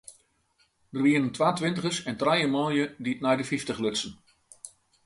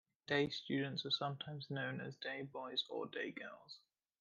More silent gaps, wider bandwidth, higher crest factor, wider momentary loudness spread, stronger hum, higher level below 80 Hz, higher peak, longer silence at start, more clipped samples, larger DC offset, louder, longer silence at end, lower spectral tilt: neither; first, 11.5 kHz vs 7.4 kHz; about the same, 20 dB vs 20 dB; about the same, 16 LU vs 14 LU; neither; first, -66 dBFS vs -82 dBFS; first, -10 dBFS vs -22 dBFS; second, 0.1 s vs 0.3 s; neither; neither; first, -27 LUFS vs -42 LUFS; about the same, 0.35 s vs 0.45 s; about the same, -4.5 dB/octave vs -5.5 dB/octave